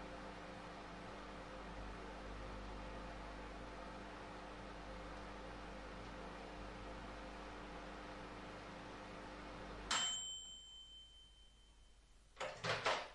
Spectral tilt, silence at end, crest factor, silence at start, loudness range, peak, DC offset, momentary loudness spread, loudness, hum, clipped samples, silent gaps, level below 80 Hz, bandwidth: -2.5 dB/octave; 0 s; 24 dB; 0 s; 6 LU; -24 dBFS; under 0.1%; 14 LU; -48 LUFS; none; under 0.1%; none; -58 dBFS; 11 kHz